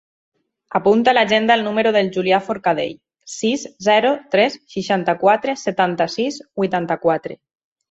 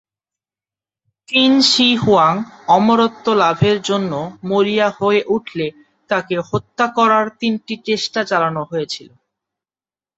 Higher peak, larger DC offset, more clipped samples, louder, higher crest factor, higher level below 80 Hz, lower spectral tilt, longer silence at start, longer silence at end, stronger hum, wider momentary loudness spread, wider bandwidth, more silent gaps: about the same, 0 dBFS vs 0 dBFS; neither; neither; about the same, -18 LUFS vs -16 LUFS; about the same, 18 dB vs 16 dB; second, -62 dBFS vs -54 dBFS; about the same, -4.5 dB/octave vs -4.5 dB/octave; second, 0.7 s vs 1.3 s; second, 0.55 s vs 1.15 s; neither; about the same, 9 LU vs 11 LU; about the same, 8 kHz vs 8.2 kHz; neither